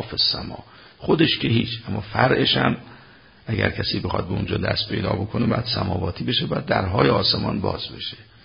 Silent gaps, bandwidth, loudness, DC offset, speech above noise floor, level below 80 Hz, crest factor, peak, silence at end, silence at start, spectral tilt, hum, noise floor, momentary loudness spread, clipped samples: none; 5.4 kHz; -22 LUFS; under 0.1%; 27 dB; -42 dBFS; 22 dB; 0 dBFS; 0.25 s; 0 s; -10 dB/octave; none; -49 dBFS; 11 LU; under 0.1%